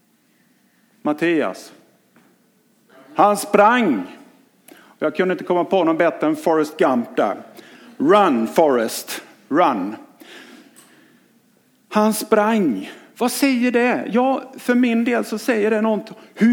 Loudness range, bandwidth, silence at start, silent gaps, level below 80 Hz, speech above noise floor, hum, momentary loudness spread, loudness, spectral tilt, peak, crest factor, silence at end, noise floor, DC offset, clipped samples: 4 LU; 18.5 kHz; 1.05 s; none; -74 dBFS; 42 dB; none; 13 LU; -18 LUFS; -5 dB/octave; 0 dBFS; 20 dB; 0 s; -59 dBFS; under 0.1%; under 0.1%